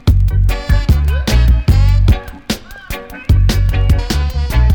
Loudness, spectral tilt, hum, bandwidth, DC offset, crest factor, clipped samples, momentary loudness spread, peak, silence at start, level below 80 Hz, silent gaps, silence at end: -14 LUFS; -6 dB/octave; none; 18.5 kHz; under 0.1%; 8 dB; under 0.1%; 11 LU; -2 dBFS; 0.05 s; -14 dBFS; none; 0 s